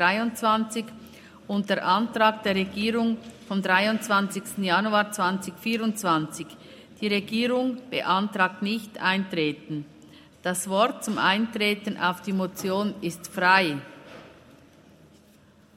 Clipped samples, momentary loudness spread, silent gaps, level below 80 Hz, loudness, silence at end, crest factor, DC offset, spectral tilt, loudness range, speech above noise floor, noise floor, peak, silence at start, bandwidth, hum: under 0.1%; 12 LU; none; -68 dBFS; -25 LUFS; 1.45 s; 22 dB; under 0.1%; -4 dB/octave; 3 LU; 31 dB; -56 dBFS; -4 dBFS; 0 s; 16 kHz; none